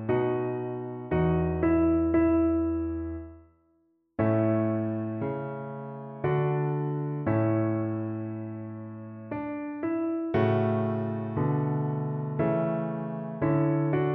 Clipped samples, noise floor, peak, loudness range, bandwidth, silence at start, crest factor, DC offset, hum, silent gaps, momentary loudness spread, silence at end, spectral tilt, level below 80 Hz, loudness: under 0.1%; -69 dBFS; -12 dBFS; 4 LU; 3.8 kHz; 0 s; 16 dB; under 0.1%; none; none; 13 LU; 0 s; -9 dB/octave; -48 dBFS; -28 LUFS